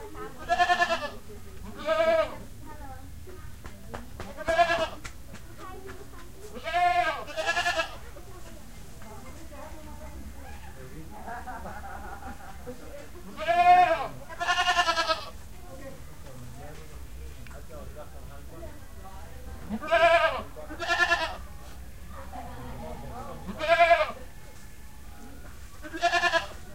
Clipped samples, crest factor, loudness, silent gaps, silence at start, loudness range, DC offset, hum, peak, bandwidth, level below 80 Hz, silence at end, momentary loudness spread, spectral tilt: under 0.1%; 22 dB; -25 LUFS; none; 0 s; 18 LU; 0.7%; none; -8 dBFS; 16 kHz; -46 dBFS; 0 s; 23 LU; -3.5 dB/octave